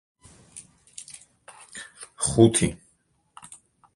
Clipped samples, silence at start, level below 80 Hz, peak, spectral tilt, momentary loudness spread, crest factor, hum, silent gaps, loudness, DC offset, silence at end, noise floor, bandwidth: under 0.1%; 0.55 s; -50 dBFS; -2 dBFS; -5 dB/octave; 27 LU; 26 dB; none; none; -21 LUFS; under 0.1%; 1.2 s; -67 dBFS; 11.5 kHz